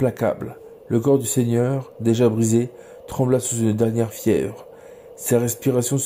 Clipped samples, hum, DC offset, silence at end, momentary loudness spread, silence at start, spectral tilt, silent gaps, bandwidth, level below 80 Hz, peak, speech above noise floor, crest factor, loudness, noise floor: under 0.1%; none; under 0.1%; 0 s; 12 LU; 0 s; -6 dB/octave; none; 16.5 kHz; -56 dBFS; -6 dBFS; 22 dB; 16 dB; -21 LUFS; -42 dBFS